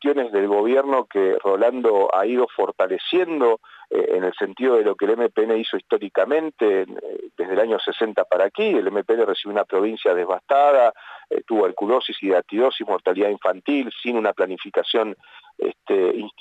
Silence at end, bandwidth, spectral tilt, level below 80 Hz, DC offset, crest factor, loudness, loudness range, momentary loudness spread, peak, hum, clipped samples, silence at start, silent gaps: 0.1 s; 8 kHz; -6 dB/octave; -82 dBFS; under 0.1%; 14 dB; -21 LUFS; 2 LU; 6 LU; -8 dBFS; none; under 0.1%; 0 s; none